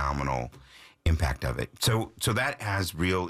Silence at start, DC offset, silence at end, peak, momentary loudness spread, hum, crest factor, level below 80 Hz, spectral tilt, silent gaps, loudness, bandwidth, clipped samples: 0 s; under 0.1%; 0 s; -14 dBFS; 6 LU; none; 14 dB; -38 dBFS; -4.5 dB/octave; none; -29 LUFS; 15.5 kHz; under 0.1%